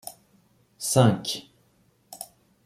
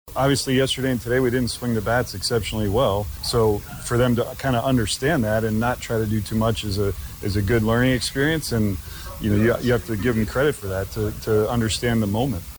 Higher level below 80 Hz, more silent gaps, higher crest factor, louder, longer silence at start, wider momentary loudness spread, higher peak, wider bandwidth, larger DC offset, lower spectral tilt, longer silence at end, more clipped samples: second, -62 dBFS vs -38 dBFS; neither; first, 22 dB vs 14 dB; about the same, -24 LUFS vs -22 LUFS; about the same, 0.05 s vs 0.05 s; first, 22 LU vs 6 LU; about the same, -6 dBFS vs -8 dBFS; second, 15 kHz vs over 20 kHz; neither; about the same, -5 dB/octave vs -5.5 dB/octave; first, 0.4 s vs 0 s; neither